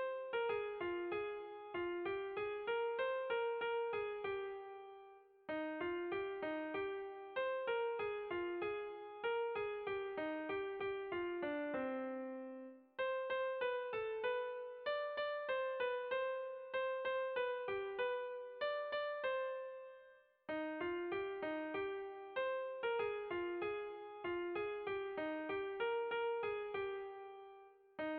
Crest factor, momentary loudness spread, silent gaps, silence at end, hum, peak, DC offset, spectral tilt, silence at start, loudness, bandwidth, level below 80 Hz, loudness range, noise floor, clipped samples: 12 dB; 8 LU; none; 0 s; none; -30 dBFS; under 0.1%; -1.5 dB/octave; 0 s; -42 LUFS; 4.9 kHz; -78 dBFS; 2 LU; -65 dBFS; under 0.1%